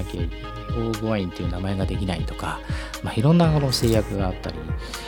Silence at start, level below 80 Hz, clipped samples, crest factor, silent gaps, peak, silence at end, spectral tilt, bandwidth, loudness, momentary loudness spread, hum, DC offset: 0 s; -34 dBFS; under 0.1%; 18 dB; none; -4 dBFS; 0 s; -6 dB/octave; 19 kHz; -24 LUFS; 12 LU; none; under 0.1%